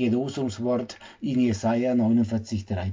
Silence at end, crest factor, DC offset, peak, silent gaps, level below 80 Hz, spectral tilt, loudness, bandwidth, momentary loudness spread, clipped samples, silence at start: 0 s; 12 dB; under 0.1%; -12 dBFS; none; -46 dBFS; -7 dB/octave; -25 LUFS; 7.6 kHz; 8 LU; under 0.1%; 0 s